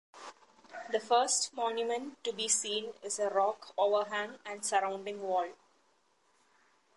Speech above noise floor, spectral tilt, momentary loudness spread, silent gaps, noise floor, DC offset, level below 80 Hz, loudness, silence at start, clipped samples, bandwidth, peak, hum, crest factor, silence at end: 39 dB; -0.5 dB/octave; 12 LU; none; -72 dBFS; under 0.1%; -88 dBFS; -33 LUFS; 0.15 s; under 0.1%; 11.5 kHz; -16 dBFS; none; 18 dB; 1.4 s